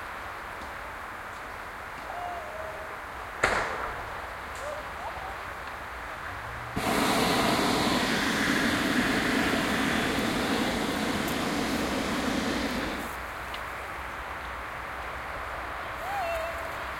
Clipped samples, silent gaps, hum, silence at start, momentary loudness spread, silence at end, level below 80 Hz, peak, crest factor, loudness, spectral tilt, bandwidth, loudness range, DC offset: under 0.1%; none; none; 0 s; 13 LU; 0 s; -48 dBFS; -8 dBFS; 22 dB; -30 LUFS; -3.5 dB/octave; 16.5 kHz; 9 LU; under 0.1%